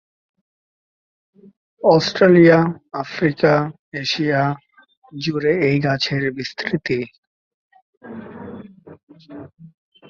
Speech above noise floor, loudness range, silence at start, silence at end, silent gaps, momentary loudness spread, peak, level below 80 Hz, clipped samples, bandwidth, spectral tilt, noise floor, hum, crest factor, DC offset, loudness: 21 dB; 13 LU; 1.85 s; 0.45 s; 3.79-3.92 s, 4.97-5.02 s, 7.18-7.70 s, 7.82-8.01 s, 9.03-9.07 s; 24 LU; -2 dBFS; -58 dBFS; under 0.1%; 7.2 kHz; -6.5 dB/octave; -39 dBFS; none; 18 dB; under 0.1%; -18 LUFS